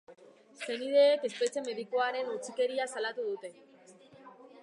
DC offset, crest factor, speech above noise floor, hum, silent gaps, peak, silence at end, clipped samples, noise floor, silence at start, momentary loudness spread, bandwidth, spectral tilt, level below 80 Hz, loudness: under 0.1%; 18 dB; 26 dB; none; none; -14 dBFS; 0 s; under 0.1%; -57 dBFS; 0.1 s; 14 LU; 11.5 kHz; -2 dB/octave; under -90 dBFS; -31 LUFS